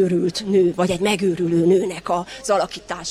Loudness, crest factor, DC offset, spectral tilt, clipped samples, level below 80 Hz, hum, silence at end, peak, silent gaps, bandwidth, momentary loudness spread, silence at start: -20 LUFS; 14 dB; under 0.1%; -5.5 dB/octave; under 0.1%; -52 dBFS; none; 0 s; -6 dBFS; none; 14 kHz; 7 LU; 0 s